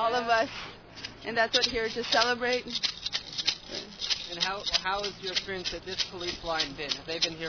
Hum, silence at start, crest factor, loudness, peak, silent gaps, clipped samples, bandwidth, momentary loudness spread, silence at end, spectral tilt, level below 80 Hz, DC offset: none; 0 s; 20 dB; -28 LUFS; -10 dBFS; none; under 0.1%; 5.4 kHz; 9 LU; 0 s; -1.5 dB/octave; -56 dBFS; under 0.1%